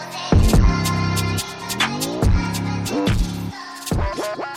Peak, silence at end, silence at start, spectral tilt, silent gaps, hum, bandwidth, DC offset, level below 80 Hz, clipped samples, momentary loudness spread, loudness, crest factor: -4 dBFS; 0 s; 0 s; -5 dB/octave; none; none; 17 kHz; under 0.1%; -24 dBFS; under 0.1%; 10 LU; -21 LUFS; 16 dB